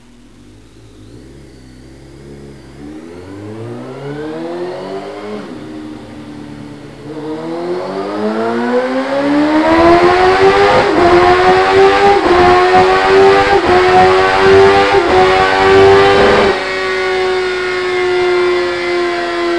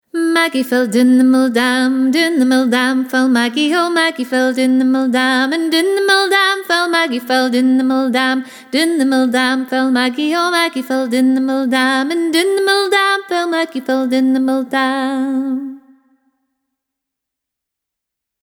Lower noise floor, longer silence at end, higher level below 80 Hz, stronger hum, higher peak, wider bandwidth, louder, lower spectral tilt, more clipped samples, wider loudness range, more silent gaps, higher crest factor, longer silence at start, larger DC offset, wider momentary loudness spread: second, -40 dBFS vs -81 dBFS; second, 0 s vs 2.65 s; first, -36 dBFS vs -70 dBFS; neither; about the same, 0 dBFS vs 0 dBFS; second, 11 kHz vs 18 kHz; first, -10 LUFS vs -14 LUFS; first, -5 dB/octave vs -3 dB/octave; neither; first, 17 LU vs 5 LU; neither; about the same, 12 dB vs 14 dB; first, 1.15 s vs 0.15 s; first, 0.5% vs under 0.1%; first, 21 LU vs 5 LU